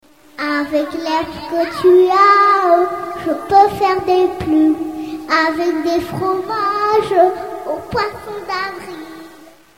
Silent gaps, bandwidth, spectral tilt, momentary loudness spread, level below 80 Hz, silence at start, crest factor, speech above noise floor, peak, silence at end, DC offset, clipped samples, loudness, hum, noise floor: none; 16 kHz; -5.5 dB/octave; 14 LU; -48 dBFS; 0.4 s; 16 dB; 28 dB; 0 dBFS; 0.35 s; 0.3%; under 0.1%; -15 LUFS; none; -42 dBFS